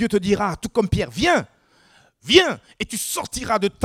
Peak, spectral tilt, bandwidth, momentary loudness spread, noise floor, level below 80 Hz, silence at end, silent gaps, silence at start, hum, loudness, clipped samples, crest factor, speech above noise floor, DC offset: 0 dBFS; -4 dB/octave; 16.5 kHz; 13 LU; -56 dBFS; -42 dBFS; 0 s; none; 0 s; none; -20 LUFS; under 0.1%; 22 dB; 35 dB; under 0.1%